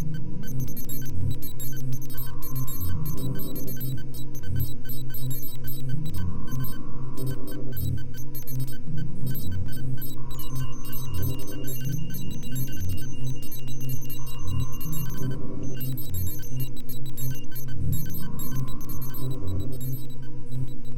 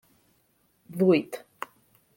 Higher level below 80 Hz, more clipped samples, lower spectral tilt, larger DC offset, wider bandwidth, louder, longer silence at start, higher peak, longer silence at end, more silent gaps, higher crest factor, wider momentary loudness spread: first, -36 dBFS vs -72 dBFS; neither; second, -6 dB/octave vs -7.5 dB/octave; first, 3% vs under 0.1%; about the same, 17 kHz vs 17 kHz; second, -33 LUFS vs -24 LUFS; second, 0 s vs 0.9 s; about the same, -10 dBFS vs -10 dBFS; second, 0 s vs 0.8 s; neither; second, 8 dB vs 20 dB; second, 5 LU vs 19 LU